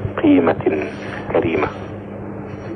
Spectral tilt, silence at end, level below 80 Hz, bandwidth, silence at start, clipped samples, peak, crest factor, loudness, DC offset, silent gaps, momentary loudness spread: -8.5 dB/octave; 0 s; -44 dBFS; 6 kHz; 0 s; under 0.1%; -2 dBFS; 16 dB; -18 LUFS; under 0.1%; none; 16 LU